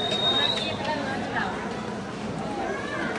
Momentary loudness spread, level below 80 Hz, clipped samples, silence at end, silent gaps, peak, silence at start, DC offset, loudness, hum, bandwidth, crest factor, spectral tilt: 11 LU; -54 dBFS; under 0.1%; 0 s; none; -12 dBFS; 0 s; under 0.1%; -27 LUFS; none; 11.5 kHz; 16 dB; -4 dB/octave